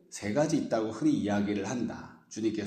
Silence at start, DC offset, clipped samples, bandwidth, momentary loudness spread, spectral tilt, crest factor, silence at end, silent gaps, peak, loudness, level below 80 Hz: 0.1 s; under 0.1%; under 0.1%; 9.6 kHz; 9 LU; -6 dB/octave; 16 dB; 0 s; none; -16 dBFS; -30 LUFS; -68 dBFS